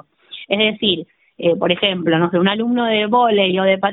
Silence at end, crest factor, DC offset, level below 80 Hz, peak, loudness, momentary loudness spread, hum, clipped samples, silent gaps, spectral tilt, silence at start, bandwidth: 0 s; 16 dB; under 0.1%; -58 dBFS; -2 dBFS; -16 LUFS; 7 LU; none; under 0.1%; none; -10 dB/octave; 0.3 s; 4.1 kHz